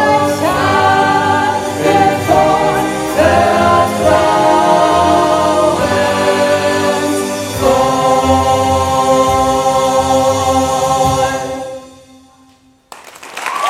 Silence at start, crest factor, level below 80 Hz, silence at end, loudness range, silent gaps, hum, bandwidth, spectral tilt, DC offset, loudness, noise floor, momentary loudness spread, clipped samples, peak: 0 s; 12 dB; -36 dBFS; 0 s; 4 LU; none; none; 16 kHz; -4.5 dB/octave; under 0.1%; -12 LUFS; -48 dBFS; 6 LU; under 0.1%; 0 dBFS